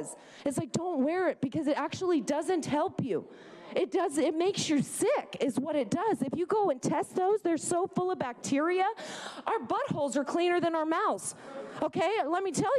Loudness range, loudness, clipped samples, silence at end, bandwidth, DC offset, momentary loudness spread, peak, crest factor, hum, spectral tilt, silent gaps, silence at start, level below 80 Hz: 1 LU; -30 LUFS; under 0.1%; 0 s; 14 kHz; under 0.1%; 7 LU; -16 dBFS; 14 dB; none; -4.5 dB/octave; none; 0 s; -72 dBFS